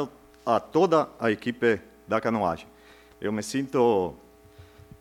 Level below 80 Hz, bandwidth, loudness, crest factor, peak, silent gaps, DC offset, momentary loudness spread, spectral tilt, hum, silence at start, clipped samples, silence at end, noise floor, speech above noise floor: -60 dBFS; 15.5 kHz; -26 LUFS; 18 dB; -8 dBFS; none; under 0.1%; 12 LU; -5.5 dB/octave; none; 0 s; under 0.1%; 0.4 s; -52 dBFS; 27 dB